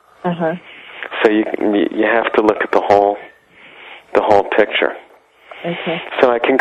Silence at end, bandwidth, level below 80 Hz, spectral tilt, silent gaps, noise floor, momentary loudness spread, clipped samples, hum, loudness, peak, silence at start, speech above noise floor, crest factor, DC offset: 0 s; 9.2 kHz; -56 dBFS; -6.5 dB/octave; none; -44 dBFS; 15 LU; under 0.1%; none; -16 LUFS; 0 dBFS; 0.25 s; 29 dB; 16 dB; under 0.1%